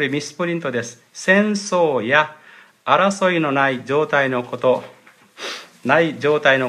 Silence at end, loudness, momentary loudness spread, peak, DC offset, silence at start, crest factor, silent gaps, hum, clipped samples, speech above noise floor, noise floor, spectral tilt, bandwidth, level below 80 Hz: 0 s; -18 LUFS; 13 LU; 0 dBFS; under 0.1%; 0 s; 20 dB; none; none; under 0.1%; 19 dB; -38 dBFS; -4.5 dB/octave; 13.5 kHz; -70 dBFS